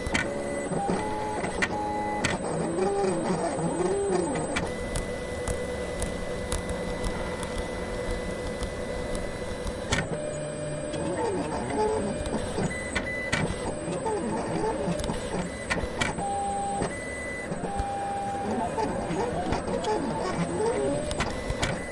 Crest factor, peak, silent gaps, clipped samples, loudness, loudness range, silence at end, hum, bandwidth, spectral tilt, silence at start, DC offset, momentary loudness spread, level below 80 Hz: 22 dB; -8 dBFS; none; under 0.1%; -30 LUFS; 4 LU; 0 s; none; 11.5 kHz; -5 dB/octave; 0 s; under 0.1%; 6 LU; -42 dBFS